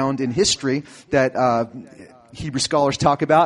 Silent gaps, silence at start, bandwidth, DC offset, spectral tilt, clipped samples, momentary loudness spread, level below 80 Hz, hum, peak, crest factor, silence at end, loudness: none; 0 s; 11.5 kHz; under 0.1%; -4 dB/octave; under 0.1%; 11 LU; -50 dBFS; none; -2 dBFS; 18 dB; 0 s; -20 LUFS